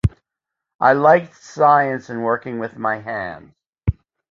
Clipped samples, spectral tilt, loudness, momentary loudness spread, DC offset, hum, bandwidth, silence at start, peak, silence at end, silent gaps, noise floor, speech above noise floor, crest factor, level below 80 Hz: under 0.1%; -7.5 dB/octave; -18 LUFS; 14 LU; under 0.1%; none; 7.6 kHz; 0.05 s; -2 dBFS; 0.4 s; 0.75-0.79 s, 3.67-3.73 s; -84 dBFS; 66 dB; 18 dB; -36 dBFS